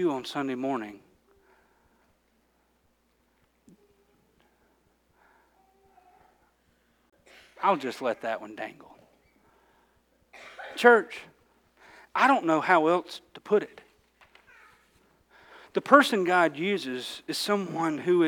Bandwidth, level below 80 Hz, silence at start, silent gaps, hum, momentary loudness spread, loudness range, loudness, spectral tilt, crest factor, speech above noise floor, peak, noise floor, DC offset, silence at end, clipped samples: 19 kHz; -74 dBFS; 0 s; none; none; 21 LU; 10 LU; -25 LUFS; -4.5 dB/octave; 26 dB; 44 dB; -2 dBFS; -69 dBFS; under 0.1%; 0 s; under 0.1%